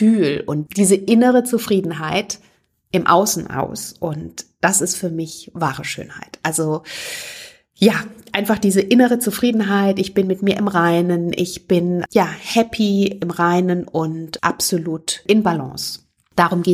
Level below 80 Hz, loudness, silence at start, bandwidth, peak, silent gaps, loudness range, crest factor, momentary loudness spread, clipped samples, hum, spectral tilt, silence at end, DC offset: -54 dBFS; -18 LUFS; 0 s; 15.5 kHz; 0 dBFS; none; 5 LU; 18 dB; 12 LU; under 0.1%; none; -4.5 dB/octave; 0 s; under 0.1%